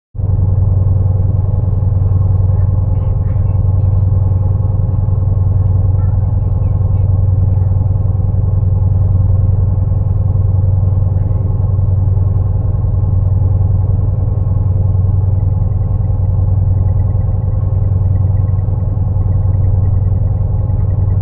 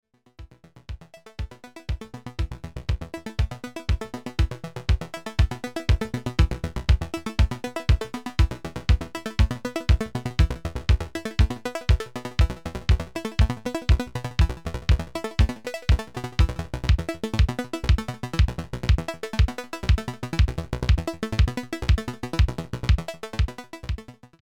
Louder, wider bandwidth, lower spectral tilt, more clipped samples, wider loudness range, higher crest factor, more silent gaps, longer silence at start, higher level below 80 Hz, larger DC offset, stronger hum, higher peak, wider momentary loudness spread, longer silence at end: first, -14 LUFS vs -26 LUFS; second, 1.4 kHz vs 13.5 kHz; first, -15 dB/octave vs -6 dB/octave; neither; second, 1 LU vs 4 LU; second, 10 dB vs 18 dB; neither; second, 0.15 s vs 0.4 s; first, -18 dBFS vs -26 dBFS; second, under 0.1% vs 0.4%; neither; first, -2 dBFS vs -6 dBFS; second, 2 LU vs 8 LU; second, 0 s vs 0.2 s